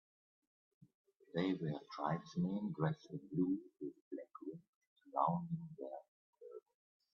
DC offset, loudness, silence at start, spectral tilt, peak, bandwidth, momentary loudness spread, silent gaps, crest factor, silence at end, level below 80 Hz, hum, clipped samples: under 0.1%; -42 LUFS; 1.35 s; -7 dB/octave; -22 dBFS; 6.8 kHz; 18 LU; 4.01-4.11 s, 4.68-4.81 s, 4.87-4.96 s, 6.08-6.33 s; 22 dB; 0.55 s; -82 dBFS; none; under 0.1%